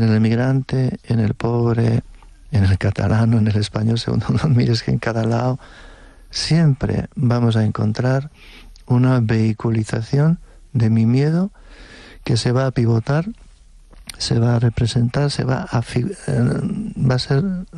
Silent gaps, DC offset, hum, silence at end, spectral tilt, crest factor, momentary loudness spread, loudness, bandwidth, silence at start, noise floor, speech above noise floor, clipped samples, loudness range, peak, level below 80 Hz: none; under 0.1%; none; 0 s; -7 dB/octave; 10 dB; 7 LU; -19 LUFS; 10.5 kHz; 0 s; -45 dBFS; 27 dB; under 0.1%; 2 LU; -8 dBFS; -40 dBFS